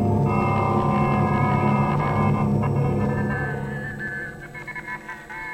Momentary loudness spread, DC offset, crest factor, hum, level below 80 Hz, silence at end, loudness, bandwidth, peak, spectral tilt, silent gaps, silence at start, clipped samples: 13 LU; under 0.1%; 14 dB; none; -40 dBFS; 0 s; -23 LUFS; 8.8 kHz; -8 dBFS; -8.5 dB/octave; none; 0 s; under 0.1%